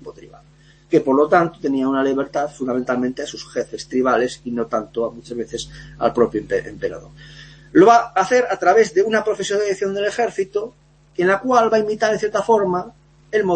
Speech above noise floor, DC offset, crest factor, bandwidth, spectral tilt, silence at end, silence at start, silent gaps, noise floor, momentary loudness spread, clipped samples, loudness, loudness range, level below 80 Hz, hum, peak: 32 dB; under 0.1%; 18 dB; 8.8 kHz; -5 dB/octave; 0 s; 0.05 s; none; -50 dBFS; 13 LU; under 0.1%; -19 LUFS; 6 LU; -52 dBFS; none; -2 dBFS